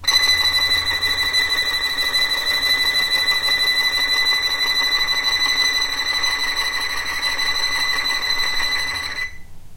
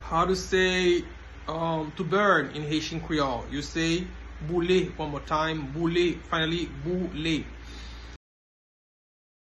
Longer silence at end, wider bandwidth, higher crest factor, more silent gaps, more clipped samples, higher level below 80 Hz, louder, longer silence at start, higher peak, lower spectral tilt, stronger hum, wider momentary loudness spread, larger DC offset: second, 0 s vs 1.3 s; first, 16 kHz vs 12 kHz; about the same, 14 dB vs 18 dB; neither; neither; about the same, -42 dBFS vs -44 dBFS; first, -17 LUFS vs -27 LUFS; about the same, 0 s vs 0 s; first, -4 dBFS vs -10 dBFS; second, 0.5 dB/octave vs -5 dB/octave; neither; second, 5 LU vs 17 LU; neither